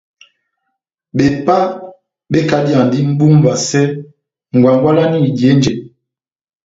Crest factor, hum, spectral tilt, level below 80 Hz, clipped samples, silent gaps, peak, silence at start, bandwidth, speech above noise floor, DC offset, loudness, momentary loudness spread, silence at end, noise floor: 14 dB; none; -6.5 dB/octave; -48 dBFS; under 0.1%; none; 0 dBFS; 1.15 s; 7.8 kHz; over 79 dB; under 0.1%; -12 LUFS; 9 LU; 0.8 s; under -90 dBFS